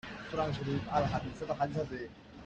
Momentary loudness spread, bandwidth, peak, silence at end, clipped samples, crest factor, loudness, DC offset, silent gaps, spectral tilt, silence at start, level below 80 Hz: 8 LU; 8.6 kHz; -16 dBFS; 0 s; under 0.1%; 18 dB; -35 LUFS; under 0.1%; none; -7 dB/octave; 0.05 s; -54 dBFS